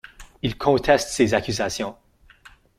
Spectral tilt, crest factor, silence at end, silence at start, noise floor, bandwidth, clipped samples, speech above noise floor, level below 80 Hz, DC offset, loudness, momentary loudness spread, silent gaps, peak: -4.5 dB/octave; 22 dB; 0.3 s; 0.2 s; -51 dBFS; 16 kHz; under 0.1%; 30 dB; -46 dBFS; under 0.1%; -22 LUFS; 11 LU; none; -2 dBFS